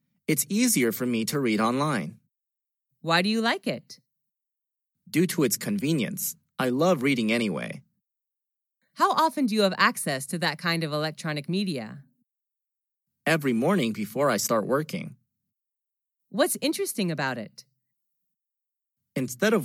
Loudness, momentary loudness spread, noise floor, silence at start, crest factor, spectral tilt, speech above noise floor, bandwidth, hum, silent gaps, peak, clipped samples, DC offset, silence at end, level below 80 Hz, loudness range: -26 LUFS; 12 LU; -87 dBFS; 0.3 s; 20 dB; -4 dB/octave; 62 dB; 17 kHz; none; none; -8 dBFS; under 0.1%; under 0.1%; 0 s; -84 dBFS; 5 LU